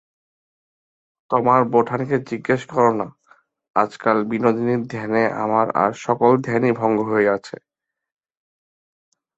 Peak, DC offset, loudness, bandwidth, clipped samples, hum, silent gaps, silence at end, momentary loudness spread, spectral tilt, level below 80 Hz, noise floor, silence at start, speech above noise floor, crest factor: -2 dBFS; under 0.1%; -19 LUFS; 8 kHz; under 0.1%; none; 3.70-3.74 s; 1.85 s; 7 LU; -7.5 dB/octave; -62 dBFS; -57 dBFS; 1.3 s; 38 dB; 20 dB